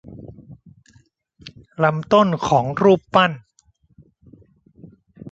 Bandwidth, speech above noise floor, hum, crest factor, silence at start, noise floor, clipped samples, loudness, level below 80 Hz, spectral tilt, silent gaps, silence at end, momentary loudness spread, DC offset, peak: 7.8 kHz; 43 dB; none; 20 dB; 0.1 s; -60 dBFS; under 0.1%; -17 LUFS; -54 dBFS; -6.5 dB/octave; none; 0 s; 24 LU; under 0.1%; -2 dBFS